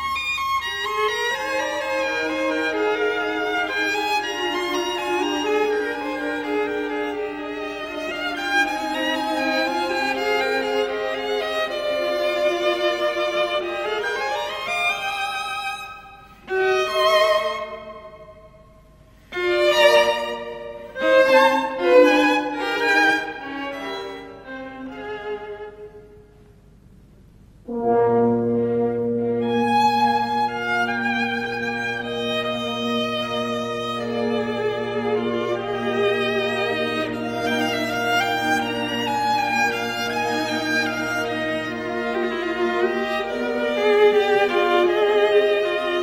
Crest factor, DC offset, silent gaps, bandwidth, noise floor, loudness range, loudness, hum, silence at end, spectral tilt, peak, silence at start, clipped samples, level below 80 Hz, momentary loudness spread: 20 dB; under 0.1%; none; 16 kHz; -50 dBFS; 6 LU; -21 LUFS; none; 0 s; -4 dB/octave; -2 dBFS; 0 s; under 0.1%; -54 dBFS; 12 LU